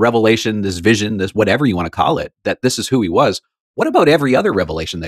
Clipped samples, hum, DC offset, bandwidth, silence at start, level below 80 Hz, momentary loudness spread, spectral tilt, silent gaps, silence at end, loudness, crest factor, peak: under 0.1%; none; under 0.1%; 14.5 kHz; 0 s; -46 dBFS; 8 LU; -5 dB/octave; 3.60-3.74 s; 0 s; -15 LUFS; 14 dB; 0 dBFS